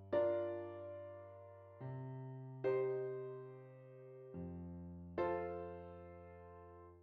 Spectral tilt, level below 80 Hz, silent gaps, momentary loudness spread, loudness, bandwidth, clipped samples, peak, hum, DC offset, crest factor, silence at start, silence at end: -7.5 dB/octave; -72 dBFS; none; 19 LU; -44 LUFS; 5 kHz; under 0.1%; -26 dBFS; none; under 0.1%; 18 dB; 0 s; 0 s